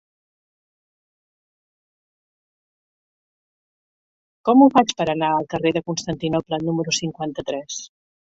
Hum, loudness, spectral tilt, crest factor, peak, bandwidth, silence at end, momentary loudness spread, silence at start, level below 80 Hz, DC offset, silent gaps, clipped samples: none; -20 LUFS; -5 dB/octave; 22 dB; -2 dBFS; 8 kHz; 0.45 s; 14 LU; 4.45 s; -60 dBFS; under 0.1%; none; under 0.1%